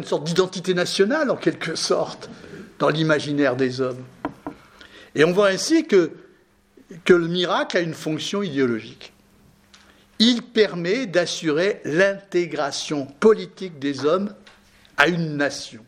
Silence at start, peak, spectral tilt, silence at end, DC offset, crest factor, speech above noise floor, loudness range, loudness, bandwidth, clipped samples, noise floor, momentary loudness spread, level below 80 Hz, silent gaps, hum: 0 s; 0 dBFS; -4.5 dB/octave; 0.1 s; under 0.1%; 22 dB; 36 dB; 3 LU; -21 LUFS; 15 kHz; under 0.1%; -57 dBFS; 14 LU; -62 dBFS; none; none